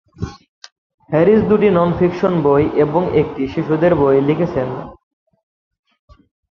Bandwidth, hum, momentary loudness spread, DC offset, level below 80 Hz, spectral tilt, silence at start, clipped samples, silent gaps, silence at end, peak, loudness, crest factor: 6.8 kHz; none; 16 LU; under 0.1%; -42 dBFS; -9 dB/octave; 0.2 s; under 0.1%; 0.49-0.62 s, 0.72-0.98 s; 1.55 s; -2 dBFS; -15 LUFS; 16 dB